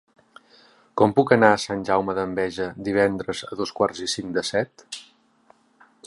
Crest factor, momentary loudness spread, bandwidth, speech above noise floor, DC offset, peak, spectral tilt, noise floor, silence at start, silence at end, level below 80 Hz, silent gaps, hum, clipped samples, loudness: 24 dB; 14 LU; 11.5 kHz; 37 dB; under 0.1%; 0 dBFS; -4.5 dB/octave; -59 dBFS; 0.95 s; 0 s; -58 dBFS; none; none; under 0.1%; -23 LUFS